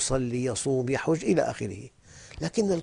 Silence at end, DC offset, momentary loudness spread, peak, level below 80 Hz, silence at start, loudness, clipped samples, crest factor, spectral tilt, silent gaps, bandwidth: 0 s; under 0.1%; 16 LU; -12 dBFS; -50 dBFS; 0 s; -28 LUFS; under 0.1%; 16 dB; -5 dB/octave; none; 10.5 kHz